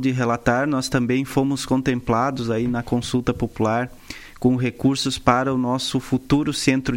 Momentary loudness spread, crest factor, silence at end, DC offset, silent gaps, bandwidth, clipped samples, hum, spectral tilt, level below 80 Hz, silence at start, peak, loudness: 4 LU; 20 dB; 0 s; under 0.1%; none; 16.5 kHz; under 0.1%; none; -5.5 dB/octave; -44 dBFS; 0 s; 0 dBFS; -21 LUFS